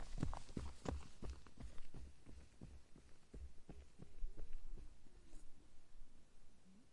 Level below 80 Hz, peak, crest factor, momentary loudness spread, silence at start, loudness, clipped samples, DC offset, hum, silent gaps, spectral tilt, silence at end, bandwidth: -54 dBFS; -28 dBFS; 20 dB; 19 LU; 0 s; -56 LUFS; under 0.1%; under 0.1%; none; none; -6 dB/octave; 0 s; 11 kHz